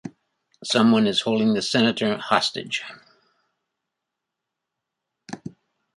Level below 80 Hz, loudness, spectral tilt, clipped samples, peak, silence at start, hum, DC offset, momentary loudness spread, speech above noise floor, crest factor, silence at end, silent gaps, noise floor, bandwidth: -66 dBFS; -21 LUFS; -4.5 dB/octave; under 0.1%; -2 dBFS; 0.05 s; none; under 0.1%; 22 LU; 62 dB; 22 dB; 0.5 s; none; -83 dBFS; 11.5 kHz